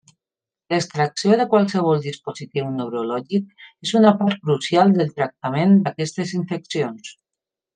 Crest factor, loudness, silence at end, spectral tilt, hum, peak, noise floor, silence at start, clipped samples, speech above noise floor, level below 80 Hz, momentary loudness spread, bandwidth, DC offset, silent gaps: 18 dB; -20 LUFS; 0.65 s; -6 dB/octave; none; -2 dBFS; -90 dBFS; 0.7 s; under 0.1%; 70 dB; -68 dBFS; 12 LU; 9.4 kHz; under 0.1%; none